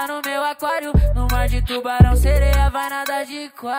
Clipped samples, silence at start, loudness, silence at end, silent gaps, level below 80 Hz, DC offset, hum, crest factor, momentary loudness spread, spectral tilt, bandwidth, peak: under 0.1%; 0 s; -19 LUFS; 0 s; none; -20 dBFS; under 0.1%; none; 16 dB; 9 LU; -6 dB/octave; 16.5 kHz; 0 dBFS